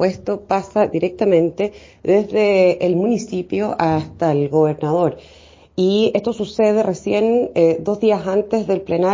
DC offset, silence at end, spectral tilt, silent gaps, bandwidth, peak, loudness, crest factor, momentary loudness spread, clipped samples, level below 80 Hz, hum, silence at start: under 0.1%; 0 s; -7 dB/octave; none; 7.6 kHz; -2 dBFS; -18 LUFS; 14 dB; 6 LU; under 0.1%; -50 dBFS; none; 0 s